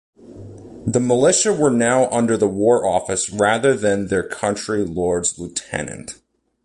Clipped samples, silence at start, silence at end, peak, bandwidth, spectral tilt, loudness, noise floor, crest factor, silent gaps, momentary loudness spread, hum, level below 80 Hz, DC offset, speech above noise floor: under 0.1%; 0.25 s; 0.5 s; -4 dBFS; 11.5 kHz; -4 dB/octave; -18 LUFS; -38 dBFS; 16 dB; none; 14 LU; none; -48 dBFS; under 0.1%; 20 dB